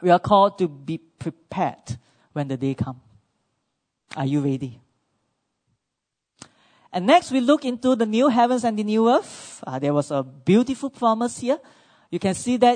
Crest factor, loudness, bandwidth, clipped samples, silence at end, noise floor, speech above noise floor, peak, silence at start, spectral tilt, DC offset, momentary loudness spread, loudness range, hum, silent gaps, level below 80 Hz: 20 dB; -22 LUFS; 9.6 kHz; under 0.1%; 0 s; -82 dBFS; 61 dB; -2 dBFS; 0 s; -6 dB/octave; under 0.1%; 16 LU; 11 LU; none; none; -60 dBFS